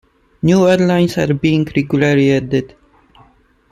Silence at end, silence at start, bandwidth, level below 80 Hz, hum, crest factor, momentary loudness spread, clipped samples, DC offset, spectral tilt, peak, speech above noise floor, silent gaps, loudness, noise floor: 1.05 s; 0.45 s; 13.5 kHz; -46 dBFS; none; 16 dB; 7 LU; under 0.1%; under 0.1%; -7 dB/octave; 0 dBFS; 38 dB; none; -14 LUFS; -51 dBFS